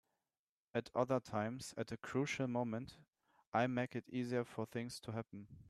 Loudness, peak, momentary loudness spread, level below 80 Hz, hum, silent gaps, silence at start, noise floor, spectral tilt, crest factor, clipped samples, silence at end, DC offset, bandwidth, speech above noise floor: -41 LUFS; -20 dBFS; 9 LU; -76 dBFS; none; 3.47-3.52 s; 0.75 s; under -90 dBFS; -6 dB/octave; 22 dB; under 0.1%; 0 s; under 0.1%; 13.5 kHz; over 49 dB